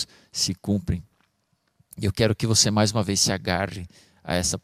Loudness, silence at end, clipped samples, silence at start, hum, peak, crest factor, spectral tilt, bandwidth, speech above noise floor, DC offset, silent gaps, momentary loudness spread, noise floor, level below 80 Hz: -23 LUFS; 0.05 s; under 0.1%; 0 s; none; -4 dBFS; 22 dB; -3.5 dB/octave; 15.5 kHz; 47 dB; under 0.1%; none; 13 LU; -71 dBFS; -46 dBFS